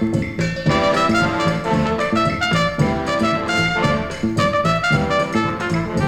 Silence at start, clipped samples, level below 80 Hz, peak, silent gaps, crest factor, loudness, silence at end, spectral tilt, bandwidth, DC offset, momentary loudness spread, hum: 0 s; under 0.1%; -38 dBFS; -4 dBFS; none; 14 dB; -18 LUFS; 0 s; -5.5 dB/octave; 15 kHz; under 0.1%; 4 LU; none